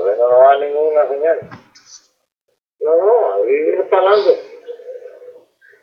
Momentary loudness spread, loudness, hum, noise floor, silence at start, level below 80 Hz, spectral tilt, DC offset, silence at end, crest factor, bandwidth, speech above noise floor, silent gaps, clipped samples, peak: 22 LU; -14 LUFS; none; -70 dBFS; 0 s; -74 dBFS; -4.5 dB/octave; under 0.1%; 0.5 s; 16 dB; 6.6 kHz; 56 dB; none; under 0.1%; 0 dBFS